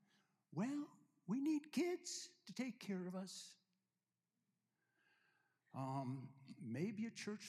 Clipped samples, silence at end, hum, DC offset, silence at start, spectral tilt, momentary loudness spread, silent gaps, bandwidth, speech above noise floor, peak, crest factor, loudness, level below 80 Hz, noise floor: under 0.1%; 0 s; none; under 0.1%; 0.5 s; -5 dB/octave; 15 LU; none; 14.5 kHz; over 43 dB; -30 dBFS; 18 dB; -47 LUFS; under -90 dBFS; under -90 dBFS